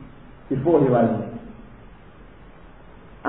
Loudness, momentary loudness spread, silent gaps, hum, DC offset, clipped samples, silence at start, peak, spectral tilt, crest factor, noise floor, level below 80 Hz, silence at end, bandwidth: -21 LUFS; 24 LU; none; none; 0.3%; under 0.1%; 0 s; -6 dBFS; -12.5 dB/octave; 18 dB; -46 dBFS; -50 dBFS; 0 s; 4 kHz